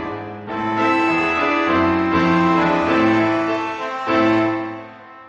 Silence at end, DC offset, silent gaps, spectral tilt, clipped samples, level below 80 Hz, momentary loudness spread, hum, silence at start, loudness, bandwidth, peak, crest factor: 0 s; under 0.1%; none; -6.5 dB/octave; under 0.1%; -50 dBFS; 12 LU; none; 0 s; -18 LUFS; 7.6 kHz; -4 dBFS; 14 dB